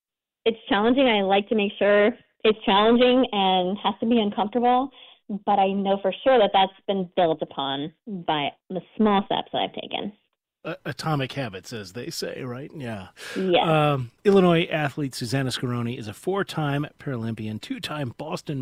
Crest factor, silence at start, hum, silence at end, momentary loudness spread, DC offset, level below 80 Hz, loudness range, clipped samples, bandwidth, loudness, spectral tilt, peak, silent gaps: 18 dB; 0.45 s; none; 0 s; 15 LU; under 0.1%; -58 dBFS; 8 LU; under 0.1%; 16 kHz; -23 LUFS; -6 dB/octave; -6 dBFS; none